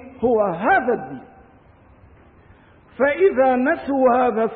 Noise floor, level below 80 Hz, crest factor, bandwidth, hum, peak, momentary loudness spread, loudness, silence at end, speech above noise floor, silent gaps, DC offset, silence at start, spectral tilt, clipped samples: -50 dBFS; -54 dBFS; 14 dB; 4.5 kHz; none; -6 dBFS; 8 LU; -18 LUFS; 0 s; 32 dB; none; under 0.1%; 0 s; -11 dB/octave; under 0.1%